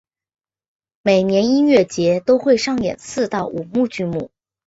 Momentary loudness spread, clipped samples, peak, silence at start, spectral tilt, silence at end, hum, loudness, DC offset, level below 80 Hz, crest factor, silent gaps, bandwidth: 9 LU; under 0.1%; -2 dBFS; 1.05 s; -5.5 dB/octave; 0.4 s; none; -18 LUFS; under 0.1%; -54 dBFS; 16 dB; none; 8 kHz